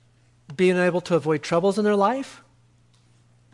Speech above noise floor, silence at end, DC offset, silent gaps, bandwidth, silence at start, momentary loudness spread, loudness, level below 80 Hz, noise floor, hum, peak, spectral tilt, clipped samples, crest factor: 37 dB; 1.2 s; under 0.1%; none; 11.5 kHz; 0.5 s; 11 LU; -22 LUFS; -68 dBFS; -58 dBFS; 60 Hz at -50 dBFS; -8 dBFS; -6 dB/octave; under 0.1%; 16 dB